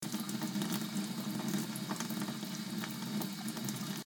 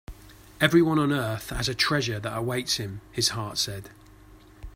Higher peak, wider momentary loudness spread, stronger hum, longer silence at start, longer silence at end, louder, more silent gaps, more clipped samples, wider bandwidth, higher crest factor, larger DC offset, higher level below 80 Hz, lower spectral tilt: second, -22 dBFS vs -6 dBFS; second, 3 LU vs 9 LU; neither; about the same, 0 s vs 0.1 s; about the same, 0.05 s vs 0 s; second, -38 LUFS vs -25 LUFS; neither; neither; first, 19 kHz vs 16 kHz; about the same, 18 dB vs 22 dB; neither; second, -78 dBFS vs -48 dBFS; about the same, -4 dB/octave vs -4 dB/octave